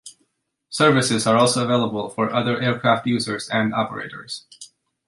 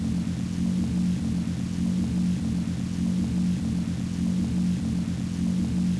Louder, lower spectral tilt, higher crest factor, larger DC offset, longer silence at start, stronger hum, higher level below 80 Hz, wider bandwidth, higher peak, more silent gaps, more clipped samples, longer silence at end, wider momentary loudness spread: first, -20 LUFS vs -27 LUFS; second, -4.5 dB/octave vs -7 dB/octave; first, 18 dB vs 10 dB; neither; about the same, 0.05 s vs 0 s; neither; second, -62 dBFS vs -42 dBFS; about the same, 11.5 kHz vs 11 kHz; first, -2 dBFS vs -16 dBFS; neither; neither; first, 0.4 s vs 0 s; first, 15 LU vs 3 LU